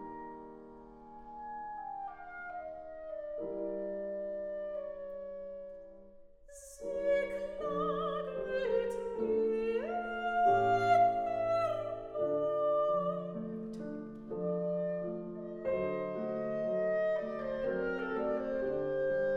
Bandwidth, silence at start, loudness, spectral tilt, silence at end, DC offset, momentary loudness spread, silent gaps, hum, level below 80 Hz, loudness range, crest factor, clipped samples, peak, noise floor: 12 kHz; 0 s; -35 LUFS; -6.5 dB/octave; 0 s; under 0.1%; 15 LU; none; none; -62 dBFS; 11 LU; 18 dB; under 0.1%; -16 dBFS; -55 dBFS